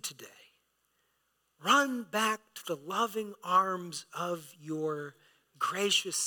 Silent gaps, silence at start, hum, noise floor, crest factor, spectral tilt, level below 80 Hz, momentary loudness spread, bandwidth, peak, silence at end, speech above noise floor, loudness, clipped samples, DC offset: none; 0.05 s; none; -77 dBFS; 22 dB; -2 dB/octave; under -90 dBFS; 14 LU; 19 kHz; -10 dBFS; 0 s; 44 dB; -31 LUFS; under 0.1%; under 0.1%